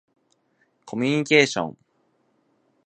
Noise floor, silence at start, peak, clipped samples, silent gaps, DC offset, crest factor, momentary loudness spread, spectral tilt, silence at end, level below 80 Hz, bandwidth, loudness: -68 dBFS; 0.85 s; -2 dBFS; under 0.1%; none; under 0.1%; 24 dB; 16 LU; -4.5 dB/octave; 1.15 s; -68 dBFS; 9.4 kHz; -21 LUFS